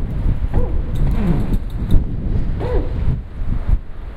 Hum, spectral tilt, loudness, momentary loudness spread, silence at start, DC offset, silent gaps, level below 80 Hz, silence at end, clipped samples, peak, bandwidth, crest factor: none; -9.5 dB/octave; -22 LUFS; 5 LU; 0 s; under 0.1%; none; -18 dBFS; 0 s; under 0.1%; 0 dBFS; 4.5 kHz; 16 dB